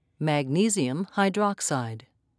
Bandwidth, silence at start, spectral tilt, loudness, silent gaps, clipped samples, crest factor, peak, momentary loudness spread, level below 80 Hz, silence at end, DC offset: 11 kHz; 0.2 s; -4.5 dB/octave; -26 LUFS; none; under 0.1%; 18 dB; -10 dBFS; 8 LU; -76 dBFS; 0.4 s; under 0.1%